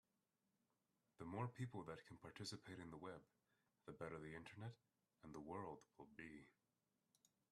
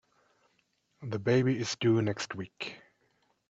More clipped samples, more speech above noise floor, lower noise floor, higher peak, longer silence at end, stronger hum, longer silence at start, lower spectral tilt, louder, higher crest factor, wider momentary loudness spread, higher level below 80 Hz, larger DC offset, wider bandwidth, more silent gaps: neither; second, 34 dB vs 44 dB; first, -90 dBFS vs -74 dBFS; second, -34 dBFS vs -14 dBFS; first, 1 s vs 0.75 s; neither; first, 1.2 s vs 1 s; about the same, -5.5 dB/octave vs -6 dB/octave; second, -56 LUFS vs -31 LUFS; about the same, 22 dB vs 18 dB; about the same, 13 LU vs 14 LU; second, -82 dBFS vs -72 dBFS; neither; first, 12.5 kHz vs 8 kHz; neither